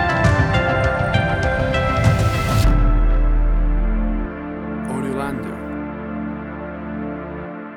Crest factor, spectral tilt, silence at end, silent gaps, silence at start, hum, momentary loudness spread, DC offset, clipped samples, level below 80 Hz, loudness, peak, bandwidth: 16 dB; -6.5 dB/octave; 0 s; none; 0 s; none; 12 LU; under 0.1%; under 0.1%; -22 dBFS; -20 LUFS; -2 dBFS; 13.5 kHz